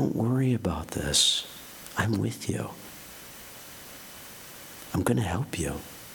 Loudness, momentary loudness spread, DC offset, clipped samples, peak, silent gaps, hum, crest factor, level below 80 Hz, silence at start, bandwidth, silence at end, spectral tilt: -27 LUFS; 20 LU; under 0.1%; under 0.1%; -8 dBFS; none; none; 22 dB; -48 dBFS; 0 s; 19 kHz; 0 s; -4 dB/octave